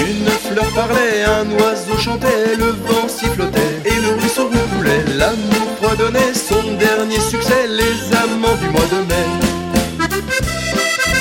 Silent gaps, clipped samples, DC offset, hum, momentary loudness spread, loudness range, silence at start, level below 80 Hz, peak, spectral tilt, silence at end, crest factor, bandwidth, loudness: none; under 0.1%; under 0.1%; none; 3 LU; 1 LU; 0 s; -32 dBFS; 0 dBFS; -4 dB/octave; 0 s; 14 dB; 17 kHz; -15 LUFS